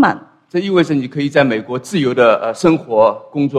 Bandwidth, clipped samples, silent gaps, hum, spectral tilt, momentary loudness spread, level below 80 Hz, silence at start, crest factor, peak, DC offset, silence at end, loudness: 13 kHz; under 0.1%; none; none; -6.5 dB/octave; 8 LU; -56 dBFS; 0 s; 14 dB; 0 dBFS; under 0.1%; 0 s; -15 LUFS